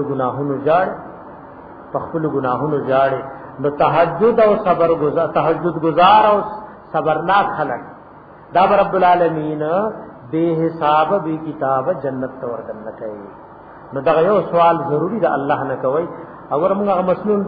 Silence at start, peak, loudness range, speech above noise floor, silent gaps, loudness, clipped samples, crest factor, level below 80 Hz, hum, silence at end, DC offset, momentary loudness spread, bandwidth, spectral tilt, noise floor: 0 s; 0 dBFS; 5 LU; 24 dB; none; -17 LUFS; under 0.1%; 16 dB; -52 dBFS; none; 0 s; under 0.1%; 16 LU; 5 kHz; -10 dB/octave; -40 dBFS